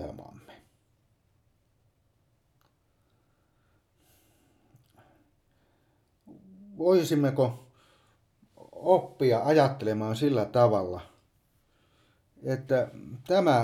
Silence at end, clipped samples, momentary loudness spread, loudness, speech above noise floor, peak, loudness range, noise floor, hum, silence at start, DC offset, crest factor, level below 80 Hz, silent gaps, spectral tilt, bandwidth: 0 s; under 0.1%; 17 LU; -26 LUFS; 45 dB; -8 dBFS; 4 LU; -70 dBFS; none; 0 s; under 0.1%; 22 dB; -66 dBFS; none; -7 dB/octave; 15.5 kHz